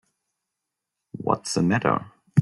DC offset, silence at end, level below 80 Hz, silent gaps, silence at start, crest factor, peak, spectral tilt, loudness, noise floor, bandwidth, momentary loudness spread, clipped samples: under 0.1%; 0 s; -62 dBFS; none; 1.15 s; 22 dB; -4 dBFS; -6 dB/octave; -24 LUFS; -84 dBFS; 12 kHz; 10 LU; under 0.1%